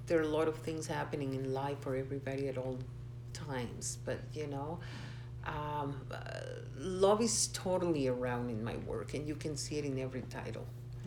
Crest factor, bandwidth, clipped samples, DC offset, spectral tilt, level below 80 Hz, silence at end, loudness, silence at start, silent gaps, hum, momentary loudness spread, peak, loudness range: 20 dB; 20 kHz; under 0.1%; under 0.1%; -5 dB/octave; -56 dBFS; 0 s; -37 LUFS; 0 s; none; none; 12 LU; -18 dBFS; 7 LU